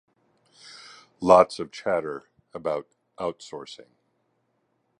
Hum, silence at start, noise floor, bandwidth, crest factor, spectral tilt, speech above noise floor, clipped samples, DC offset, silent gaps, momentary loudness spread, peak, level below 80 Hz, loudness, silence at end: none; 1.2 s; -73 dBFS; 11 kHz; 26 dB; -5.5 dB/octave; 49 dB; under 0.1%; under 0.1%; none; 27 LU; -2 dBFS; -62 dBFS; -24 LUFS; 1.25 s